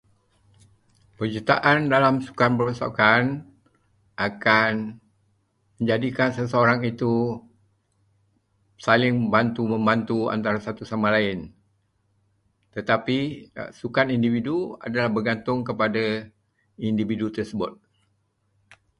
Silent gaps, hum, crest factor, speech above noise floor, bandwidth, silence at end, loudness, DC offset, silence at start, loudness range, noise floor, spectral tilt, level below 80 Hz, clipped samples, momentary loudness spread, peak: none; none; 22 dB; 47 dB; 10.5 kHz; 1.25 s; -23 LUFS; under 0.1%; 1.2 s; 5 LU; -70 dBFS; -7 dB/octave; -58 dBFS; under 0.1%; 13 LU; -2 dBFS